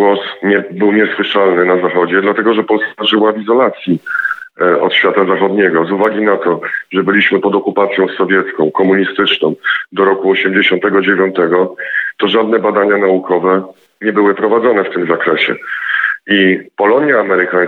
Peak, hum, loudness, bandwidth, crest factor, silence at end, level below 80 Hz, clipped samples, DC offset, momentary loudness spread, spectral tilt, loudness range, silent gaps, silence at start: 0 dBFS; none; -12 LUFS; 4.5 kHz; 12 dB; 0 s; -66 dBFS; under 0.1%; under 0.1%; 5 LU; -7.5 dB/octave; 1 LU; none; 0 s